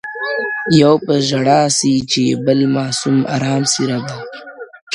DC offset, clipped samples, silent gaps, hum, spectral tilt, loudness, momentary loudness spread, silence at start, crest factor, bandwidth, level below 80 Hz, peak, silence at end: under 0.1%; under 0.1%; 4.82-4.87 s; none; -4.5 dB/octave; -15 LUFS; 16 LU; 0.05 s; 16 dB; 11.5 kHz; -54 dBFS; 0 dBFS; 0 s